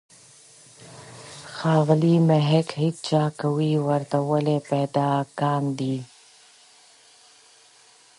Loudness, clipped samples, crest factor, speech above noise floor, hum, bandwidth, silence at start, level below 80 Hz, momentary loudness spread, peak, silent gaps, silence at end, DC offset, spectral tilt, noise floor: -23 LUFS; under 0.1%; 18 dB; 33 dB; none; 11.5 kHz; 0.8 s; -68 dBFS; 21 LU; -6 dBFS; none; 2.15 s; under 0.1%; -7.5 dB/octave; -54 dBFS